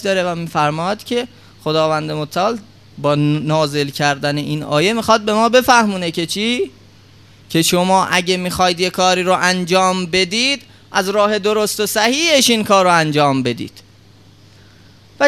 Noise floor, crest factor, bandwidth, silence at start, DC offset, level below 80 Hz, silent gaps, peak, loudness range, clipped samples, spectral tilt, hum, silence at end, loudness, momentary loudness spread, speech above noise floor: -46 dBFS; 16 dB; 14 kHz; 0 s; 0.2%; -52 dBFS; none; 0 dBFS; 4 LU; under 0.1%; -4 dB/octave; none; 0 s; -15 LUFS; 9 LU; 30 dB